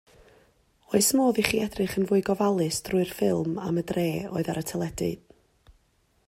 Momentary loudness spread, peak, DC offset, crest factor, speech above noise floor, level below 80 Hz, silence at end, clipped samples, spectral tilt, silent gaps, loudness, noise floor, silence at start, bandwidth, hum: 8 LU; -4 dBFS; under 0.1%; 22 dB; 42 dB; -56 dBFS; 1.1 s; under 0.1%; -4.5 dB/octave; none; -26 LUFS; -67 dBFS; 0.9 s; 16 kHz; none